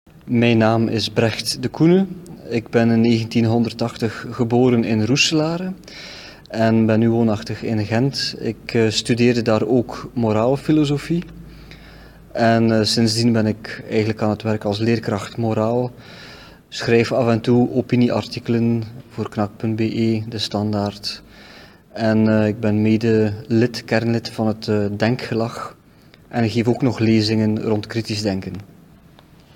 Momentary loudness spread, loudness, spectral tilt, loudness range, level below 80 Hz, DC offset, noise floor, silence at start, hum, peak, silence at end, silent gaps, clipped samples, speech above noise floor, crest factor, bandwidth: 12 LU; -19 LUFS; -6 dB/octave; 3 LU; -50 dBFS; under 0.1%; -48 dBFS; 0.25 s; none; -2 dBFS; 0.9 s; none; under 0.1%; 30 dB; 18 dB; 15 kHz